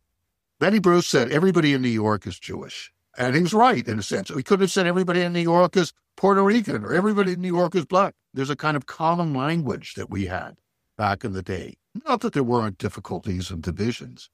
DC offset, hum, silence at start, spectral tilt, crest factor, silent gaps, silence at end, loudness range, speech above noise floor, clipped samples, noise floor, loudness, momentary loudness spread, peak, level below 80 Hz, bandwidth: under 0.1%; none; 0.6 s; -6 dB/octave; 18 dB; none; 0.1 s; 6 LU; 56 dB; under 0.1%; -78 dBFS; -22 LUFS; 14 LU; -4 dBFS; -54 dBFS; 15 kHz